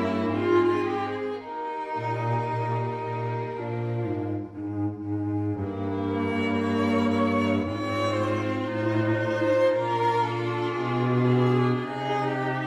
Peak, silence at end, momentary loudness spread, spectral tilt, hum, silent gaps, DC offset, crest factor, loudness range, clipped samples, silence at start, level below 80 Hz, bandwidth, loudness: -10 dBFS; 0 s; 8 LU; -8 dB/octave; none; none; under 0.1%; 16 dB; 5 LU; under 0.1%; 0 s; -62 dBFS; 10 kHz; -26 LUFS